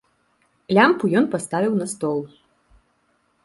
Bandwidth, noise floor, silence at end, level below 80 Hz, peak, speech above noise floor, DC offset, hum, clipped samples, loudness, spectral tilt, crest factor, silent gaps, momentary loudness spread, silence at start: 11.5 kHz; -66 dBFS; 1.2 s; -64 dBFS; -2 dBFS; 46 dB; under 0.1%; none; under 0.1%; -20 LUFS; -5.5 dB/octave; 20 dB; none; 10 LU; 0.7 s